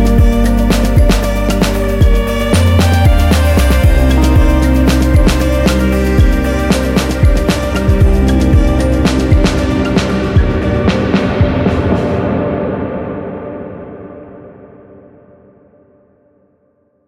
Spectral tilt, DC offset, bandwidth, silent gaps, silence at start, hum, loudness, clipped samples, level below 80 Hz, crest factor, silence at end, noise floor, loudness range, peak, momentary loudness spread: -6.5 dB/octave; under 0.1%; 16.5 kHz; none; 0 s; none; -12 LUFS; under 0.1%; -14 dBFS; 10 dB; 2.4 s; -56 dBFS; 10 LU; 0 dBFS; 9 LU